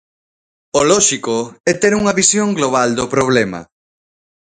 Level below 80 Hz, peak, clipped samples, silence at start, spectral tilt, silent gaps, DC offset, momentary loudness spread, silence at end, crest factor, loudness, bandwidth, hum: -50 dBFS; 0 dBFS; under 0.1%; 0.75 s; -3 dB/octave; 1.60-1.64 s; under 0.1%; 8 LU; 0.85 s; 16 dB; -14 LUFS; 9.6 kHz; none